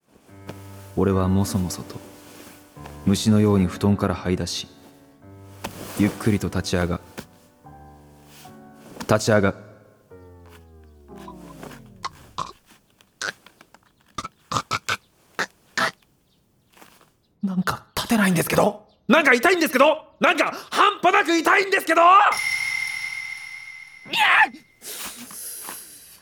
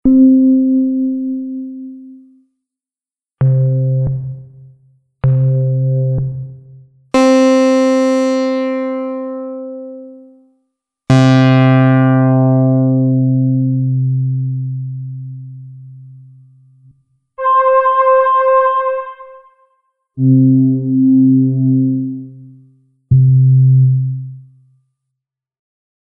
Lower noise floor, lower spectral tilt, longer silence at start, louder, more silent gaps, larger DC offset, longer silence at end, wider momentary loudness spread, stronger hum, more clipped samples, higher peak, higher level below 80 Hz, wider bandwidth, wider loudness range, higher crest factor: second, -63 dBFS vs under -90 dBFS; second, -4.5 dB/octave vs -8.5 dB/octave; first, 0.35 s vs 0.05 s; second, -21 LUFS vs -13 LUFS; neither; neither; second, 0.25 s vs 1.7 s; first, 24 LU vs 19 LU; neither; neither; about the same, 0 dBFS vs -2 dBFS; second, -54 dBFS vs -46 dBFS; first, over 20 kHz vs 8 kHz; first, 15 LU vs 7 LU; first, 24 dB vs 12 dB